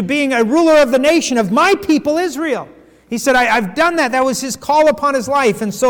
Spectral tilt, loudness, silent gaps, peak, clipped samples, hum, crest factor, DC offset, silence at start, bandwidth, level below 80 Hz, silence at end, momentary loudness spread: -4 dB/octave; -14 LUFS; none; -4 dBFS; under 0.1%; none; 8 dB; under 0.1%; 0 s; 19 kHz; -48 dBFS; 0 s; 8 LU